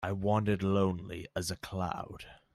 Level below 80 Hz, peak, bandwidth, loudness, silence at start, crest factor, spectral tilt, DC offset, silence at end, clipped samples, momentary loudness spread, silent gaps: -58 dBFS; -18 dBFS; 14 kHz; -33 LUFS; 0 s; 16 dB; -6 dB/octave; under 0.1%; 0.2 s; under 0.1%; 11 LU; none